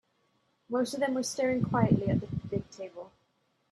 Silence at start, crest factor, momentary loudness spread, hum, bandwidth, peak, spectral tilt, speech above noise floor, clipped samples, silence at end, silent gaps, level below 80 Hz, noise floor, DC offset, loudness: 0.7 s; 22 dB; 17 LU; none; 13 kHz; -10 dBFS; -6 dB/octave; 44 dB; under 0.1%; 0.65 s; none; -58 dBFS; -74 dBFS; under 0.1%; -30 LUFS